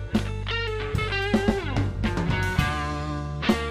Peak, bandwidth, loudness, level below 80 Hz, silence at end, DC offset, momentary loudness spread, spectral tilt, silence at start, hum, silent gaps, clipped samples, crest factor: -8 dBFS; 15 kHz; -26 LUFS; -34 dBFS; 0 s; under 0.1%; 5 LU; -6 dB/octave; 0 s; none; none; under 0.1%; 18 dB